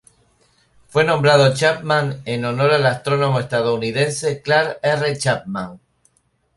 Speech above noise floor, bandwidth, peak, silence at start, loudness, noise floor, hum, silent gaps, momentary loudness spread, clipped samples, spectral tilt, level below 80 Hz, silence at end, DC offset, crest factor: 46 dB; 11.5 kHz; -2 dBFS; 0.95 s; -18 LUFS; -64 dBFS; none; none; 10 LU; under 0.1%; -5 dB/octave; -56 dBFS; 0.8 s; under 0.1%; 18 dB